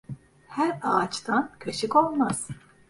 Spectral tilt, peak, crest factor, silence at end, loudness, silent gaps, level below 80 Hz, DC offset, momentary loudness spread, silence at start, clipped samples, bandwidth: -4.5 dB/octave; -6 dBFS; 22 dB; 0.3 s; -26 LUFS; none; -62 dBFS; under 0.1%; 16 LU; 0.1 s; under 0.1%; 11.5 kHz